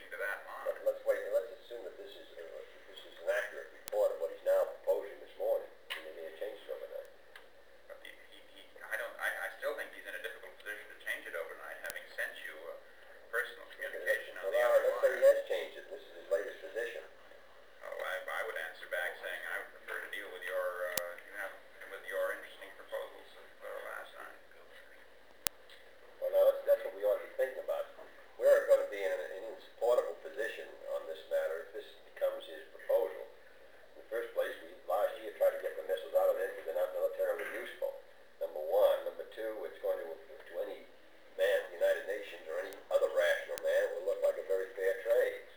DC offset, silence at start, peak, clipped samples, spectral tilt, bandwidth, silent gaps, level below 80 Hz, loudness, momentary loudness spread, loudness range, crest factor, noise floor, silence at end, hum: 0.1%; 0 s; 0 dBFS; under 0.1%; -1.5 dB/octave; over 20 kHz; none; -80 dBFS; -36 LUFS; 20 LU; 10 LU; 36 dB; -61 dBFS; 0 s; none